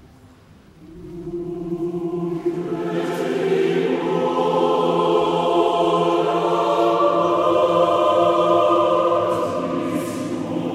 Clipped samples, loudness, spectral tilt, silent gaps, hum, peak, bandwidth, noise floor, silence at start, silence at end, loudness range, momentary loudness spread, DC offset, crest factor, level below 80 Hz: under 0.1%; -19 LUFS; -6.5 dB/octave; none; none; -4 dBFS; 13.5 kHz; -48 dBFS; 0.8 s; 0 s; 7 LU; 9 LU; under 0.1%; 14 dB; -56 dBFS